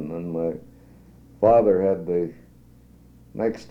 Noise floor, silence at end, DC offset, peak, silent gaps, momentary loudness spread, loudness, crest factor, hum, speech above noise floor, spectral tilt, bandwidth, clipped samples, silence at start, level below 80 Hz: -51 dBFS; 0 s; under 0.1%; -4 dBFS; none; 15 LU; -22 LUFS; 20 dB; none; 29 dB; -9 dB/octave; 7.8 kHz; under 0.1%; 0 s; -54 dBFS